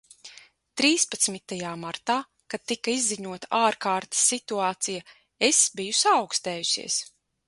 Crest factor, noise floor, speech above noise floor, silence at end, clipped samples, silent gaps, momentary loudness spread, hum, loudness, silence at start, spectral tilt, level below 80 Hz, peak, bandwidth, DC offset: 20 dB; -52 dBFS; 26 dB; 0.45 s; under 0.1%; none; 13 LU; none; -24 LUFS; 0.25 s; -1 dB/octave; -72 dBFS; -6 dBFS; 12 kHz; under 0.1%